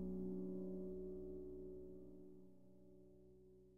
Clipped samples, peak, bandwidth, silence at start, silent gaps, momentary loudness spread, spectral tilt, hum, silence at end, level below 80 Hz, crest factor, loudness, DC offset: under 0.1%; -38 dBFS; 1.5 kHz; 0 s; none; 19 LU; -11.5 dB/octave; none; 0 s; -66 dBFS; 14 dB; -51 LUFS; under 0.1%